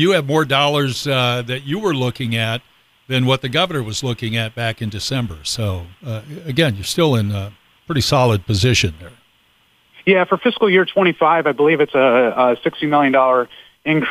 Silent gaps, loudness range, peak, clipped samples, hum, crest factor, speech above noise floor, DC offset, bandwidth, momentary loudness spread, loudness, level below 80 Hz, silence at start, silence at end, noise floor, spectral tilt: none; 6 LU; 0 dBFS; under 0.1%; none; 16 dB; 40 dB; under 0.1%; 15.5 kHz; 9 LU; -17 LUFS; -46 dBFS; 0 s; 0 s; -57 dBFS; -5 dB/octave